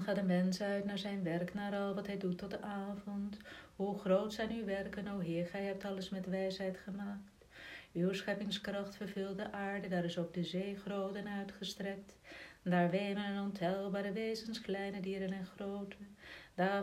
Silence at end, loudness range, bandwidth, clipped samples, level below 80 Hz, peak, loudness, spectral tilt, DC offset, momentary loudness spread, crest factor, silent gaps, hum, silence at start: 0 s; 3 LU; 15 kHz; under 0.1%; -68 dBFS; -20 dBFS; -39 LUFS; -6.5 dB/octave; under 0.1%; 12 LU; 20 dB; none; none; 0 s